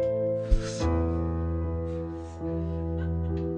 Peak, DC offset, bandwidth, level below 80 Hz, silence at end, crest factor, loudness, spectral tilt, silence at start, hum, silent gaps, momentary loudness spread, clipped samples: -10 dBFS; under 0.1%; 9.2 kHz; -34 dBFS; 0 s; 18 dB; -30 LUFS; -7.5 dB/octave; 0 s; none; none; 6 LU; under 0.1%